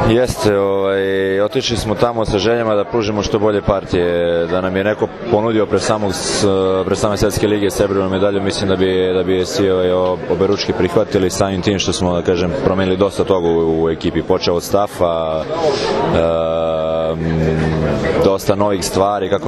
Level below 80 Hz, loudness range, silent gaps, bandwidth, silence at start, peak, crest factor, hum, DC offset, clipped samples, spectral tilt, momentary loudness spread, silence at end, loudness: -36 dBFS; 1 LU; none; 13.5 kHz; 0 s; 0 dBFS; 16 dB; none; under 0.1%; under 0.1%; -5.5 dB/octave; 3 LU; 0 s; -16 LUFS